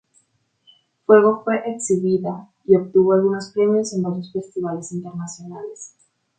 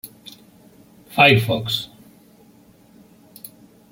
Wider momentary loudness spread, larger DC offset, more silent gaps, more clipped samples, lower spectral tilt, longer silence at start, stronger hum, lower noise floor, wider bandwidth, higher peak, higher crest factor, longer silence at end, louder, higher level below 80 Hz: second, 19 LU vs 28 LU; neither; neither; neither; about the same, -6 dB/octave vs -5 dB/octave; first, 1.1 s vs 0.05 s; neither; first, -64 dBFS vs -51 dBFS; second, 9.4 kHz vs 16.5 kHz; about the same, 0 dBFS vs -2 dBFS; about the same, 20 dB vs 22 dB; second, 0.5 s vs 2.05 s; about the same, -19 LUFS vs -17 LUFS; second, -66 dBFS vs -56 dBFS